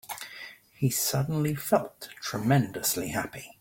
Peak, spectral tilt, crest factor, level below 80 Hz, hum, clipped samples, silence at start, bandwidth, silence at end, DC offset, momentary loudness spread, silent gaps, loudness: -8 dBFS; -4.5 dB/octave; 20 dB; -60 dBFS; none; under 0.1%; 0.05 s; 17 kHz; 0.1 s; under 0.1%; 15 LU; none; -28 LUFS